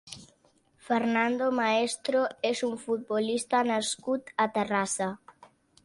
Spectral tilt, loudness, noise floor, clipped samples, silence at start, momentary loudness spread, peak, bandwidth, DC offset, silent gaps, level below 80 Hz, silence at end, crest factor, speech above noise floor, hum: -3.5 dB/octave; -28 LUFS; -66 dBFS; under 0.1%; 0.05 s; 6 LU; -14 dBFS; 11.5 kHz; under 0.1%; none; -72 dBFS; 0.7 s; 16 dB; 38 dB; none